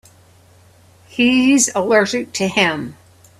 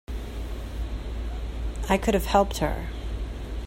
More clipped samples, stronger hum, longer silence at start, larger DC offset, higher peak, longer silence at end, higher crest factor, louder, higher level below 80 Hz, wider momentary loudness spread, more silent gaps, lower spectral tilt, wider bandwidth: neither; neither; first, 1.15 s vs 0.1 s; neither; first, 0 dBFS vs -6 dBFS; first, 0.45 s vs 0 s; about the same, 18 dB vs 20 dB; first, -15 LUFS vs -28 LUFS; second, -58 dBFS vs -32 dBFS; about the same, 15 LU vs 13 LU; neither; second, -3 dB/octave vs -5.5 dB/octave; second, 13.5 kHz vs 16 kHz